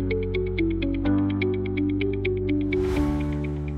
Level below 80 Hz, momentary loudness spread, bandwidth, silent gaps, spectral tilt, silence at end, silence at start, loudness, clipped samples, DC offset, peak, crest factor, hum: -34 dBFS; 3 LU; 8.6 kHz; none; -8.5 dB/octave; 0 s; 0 s; -25 LUFS; under 0.1%; under 0.1%; -12 dBFS; 14 dB; none